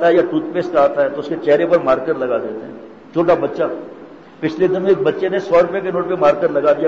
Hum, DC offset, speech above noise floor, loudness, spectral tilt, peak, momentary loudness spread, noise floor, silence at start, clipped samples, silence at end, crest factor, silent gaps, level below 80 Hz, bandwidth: none; 0.2%; 22 dB; -17 LUFS; -7.5 dB/octave; -4 dBFS; 10 LU; -38 dBFS; 0 s; under 0.1%; 0 s; 12 dB; none; -54 dBFS; 7.4 kHz